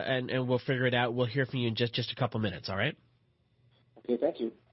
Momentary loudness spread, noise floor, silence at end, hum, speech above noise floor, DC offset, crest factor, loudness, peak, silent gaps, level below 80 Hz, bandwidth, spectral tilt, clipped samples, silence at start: 6 LU; -70 dBFS; 0.2 s; none; 39 dB; under 0.1%; 18 dB; -31 LUFS; -14 dBFS; none; -66 dBFS; 6 kHz; -8.5 dB/octave; under 0.1%; 0 s